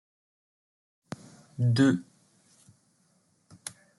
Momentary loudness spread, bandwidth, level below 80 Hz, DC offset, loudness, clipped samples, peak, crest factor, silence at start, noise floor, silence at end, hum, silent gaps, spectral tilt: 22 LU; 12 kHz; -72 dBFS; under 0.1%; -26 LUFS; under 0.1%; -12 dBFS; 20 dB; 1.6 s; -69 dBFS; 0.3 s; none; none; -6.5 dB/octave